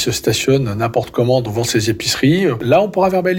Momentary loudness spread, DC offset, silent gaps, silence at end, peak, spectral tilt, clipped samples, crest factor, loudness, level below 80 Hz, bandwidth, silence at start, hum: 4 LU; under 0.1%; none; 0 s; -4 dBFS; -5 dB/octave; under 0.1%; 12 dB; -16 LUFS; -44 dBFS; 17 kHz; 0 s; none